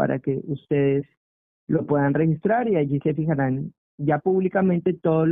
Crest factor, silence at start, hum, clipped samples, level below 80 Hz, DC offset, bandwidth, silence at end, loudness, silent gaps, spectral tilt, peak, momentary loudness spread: 14 dB; 0 s; none; under 0.1%; -56 dBFS; under 0.1%; 3.7 kHz; 0 s; -23 LUFS; 1.17-1.67 s, 3.78-3.98 s; -13 dB/octave; -8 dBFS; 7 LU